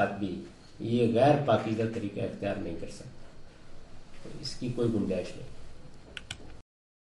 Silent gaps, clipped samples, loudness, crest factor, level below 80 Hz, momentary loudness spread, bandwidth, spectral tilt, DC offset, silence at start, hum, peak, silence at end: none; under 0.1%; -30 LUFS; 20 dB; -52 dBFS; 24 LU; 11.5 kHz; -7 dB/octave; under 0.1%; 0 s; none; -12 dBFS; 0.5 s